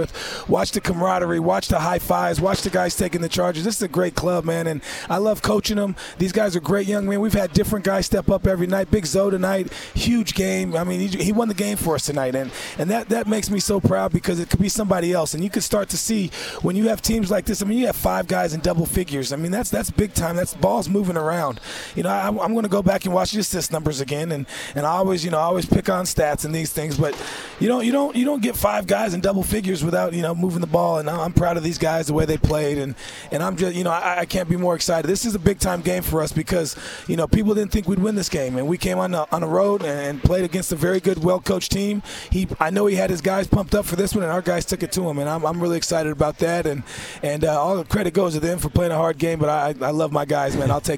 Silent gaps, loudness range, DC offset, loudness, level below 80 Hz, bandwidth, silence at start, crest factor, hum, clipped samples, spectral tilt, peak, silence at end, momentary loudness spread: none; 1 LU; under 0.1%; -21 LUFS; -38 dBFS; 17.5 kHz; 0 s; 20 dB; none; under 0.1%; -5 dB/octave; 0 dBFS; 0 s; 5 LU